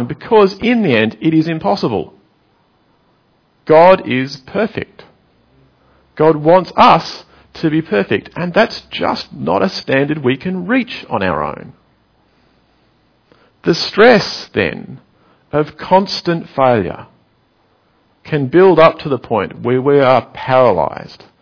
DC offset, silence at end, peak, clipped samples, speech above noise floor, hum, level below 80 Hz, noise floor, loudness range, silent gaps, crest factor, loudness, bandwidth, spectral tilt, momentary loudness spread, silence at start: under 0.1%; 0.25 s; 0 dBFS; 0.2%; 43 dB; none; -48 dBFS; -56 dBFS; 4 LU; none; 14 dB; -14 LUFS; 5.4 kHz; -6.5 dB/octave; 13 LU; 0 s